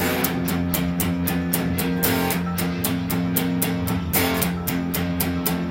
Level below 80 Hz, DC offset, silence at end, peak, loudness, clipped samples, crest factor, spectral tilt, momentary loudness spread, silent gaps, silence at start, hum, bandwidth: -44 dBFS; under 0.1%; 0 s; -4 dBFS; -22 LUFS; under 0.1%; 18 dB; -5 dB/octave; 3 LU; none; 0 s; none; 17 kHz